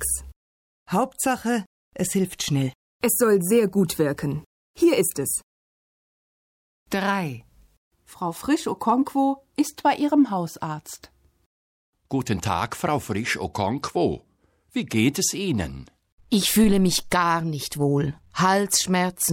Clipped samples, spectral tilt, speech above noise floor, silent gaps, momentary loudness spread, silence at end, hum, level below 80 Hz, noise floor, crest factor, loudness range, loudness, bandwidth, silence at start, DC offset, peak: under 0.1%; -4.5 dB/octave; over 67 dB; 0.36-0.86 s, 1.66-1.91 s, 2.75-3.00 s, 4.46-4.74 s, 5.43-6.86 s, 7.77-7.91 s, 11.46-11.93 s, 16.12-16.18 s; 11 LU; 0 s; none; -48 dBFS; under -90 dBFS; 16 dB; 6 LU; -23 LUFS; 17 kHz; 0 s; under 0.1%; -8 dBFS